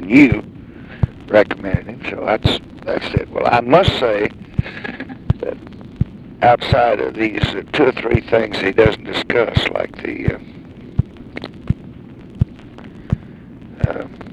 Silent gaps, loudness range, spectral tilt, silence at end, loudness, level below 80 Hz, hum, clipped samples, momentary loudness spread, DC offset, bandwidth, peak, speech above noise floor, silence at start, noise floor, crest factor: none; 9 LU; -7.5 dB/octave; 0 s; -18 LUFS; -34 dBFS; none; under 0.1%; 23 LU; under 0.1%; 11.5 kHz; 0 dBFS; 21 dB; 0 s; -37 dBFS; 18 dB